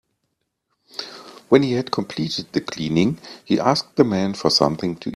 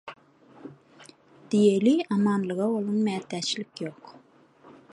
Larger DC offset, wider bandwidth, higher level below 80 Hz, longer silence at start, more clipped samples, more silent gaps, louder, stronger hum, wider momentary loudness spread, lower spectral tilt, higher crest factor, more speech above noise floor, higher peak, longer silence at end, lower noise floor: neither; first, 13.5 kHz vs 11.5 kHz; first, -56 dBFS vs -74 dBFS; first, 0.95 s vs 0.05 s; neither; neither; first, -20 LUFS vs -25 LUFS; neither; second, 16 LU vs 26 LU; about the same, -5.5 dB/octave vs -6 dB/octave; about the same, 22 dB vs 18 dB; first, 55 dB vs 31 dB; first, 0 dBFS vs -10 dBFS; second, 0 s vs 0.8 s; first, -75 dBFS vs -56 dBFS